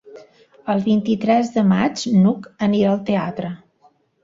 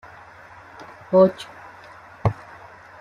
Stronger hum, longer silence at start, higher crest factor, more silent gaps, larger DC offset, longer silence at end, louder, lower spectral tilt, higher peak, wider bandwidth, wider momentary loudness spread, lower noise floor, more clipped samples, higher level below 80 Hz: neither; second, 0.05 s vs 0.8 s; about the same, 16 dB vs 20 dB; neither; neither; about the same, 0.7 s vs 0.7 s; about the same, -19 LUFS vs -20 LUFS; about the same, -7 dB/octave vs -8 dB/octave; about the same, -4 dBFS vs -4 dBFS; second, 7.8 kHz vs 10 kHz; second, 12 LU vs 27 LU; first, -57 dBFS vs -45 dBFS; neither; second, -58 dBFS vs -50 dBFS